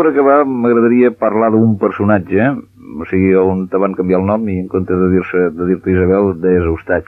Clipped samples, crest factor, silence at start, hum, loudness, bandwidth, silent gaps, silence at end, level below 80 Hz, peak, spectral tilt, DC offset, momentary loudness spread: under 0.1%; 12 dB; 0 s; none; -13 LUFS; 4.1 kHz; none; 0.05 s; -40 dBFS; 0 dBFS; -11 dB/octave; under 0.1%; 6 LU